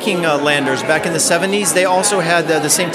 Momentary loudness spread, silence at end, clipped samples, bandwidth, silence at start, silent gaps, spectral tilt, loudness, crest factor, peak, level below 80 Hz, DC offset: 2 LU; 0 s; under 0.1%; 15.5 kHz; 0 s; none; -2.5 dB/octave; -14 LUFS; 14 dB; 0 dBFS; -58 dBFS; under 0.1%